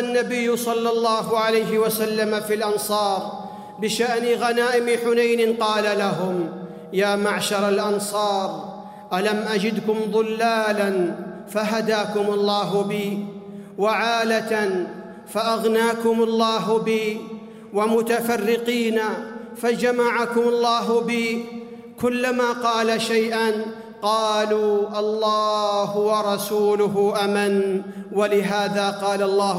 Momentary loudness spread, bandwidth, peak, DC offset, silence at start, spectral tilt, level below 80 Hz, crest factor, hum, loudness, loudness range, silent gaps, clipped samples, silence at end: 9 LU; 16 kHz; -8 dBFS; under 0.1%; 0 s; -4.5 dB/octave; -68 dBFS; 14 dB; none; -21 LUFS; 2 LU; none; under 0.1%; 0 s